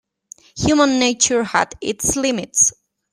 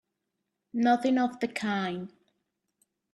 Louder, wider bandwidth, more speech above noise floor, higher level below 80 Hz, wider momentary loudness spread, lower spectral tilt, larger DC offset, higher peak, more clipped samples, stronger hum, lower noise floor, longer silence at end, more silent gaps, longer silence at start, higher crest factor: first, -17 LUFS vs -28 LUFS; first, 15.5 kHz vs 11.5 kHz; second, 29 dB vs 56 dB; first, -46 dBFS vs -76 dBFS; second, 7 LU vs 14 LU; second, -2.5 dB/octave vs -5.5 dB/octave; neither; first, -2 dBFS vs -12 dBFS; neither; neither; second, -46 dBFS vs -83 dBFS; second, 0.4 s vs 1.05 s; neither; second, 0.55 s vs 0.75 s; about the same, 18 dB vs 18 dB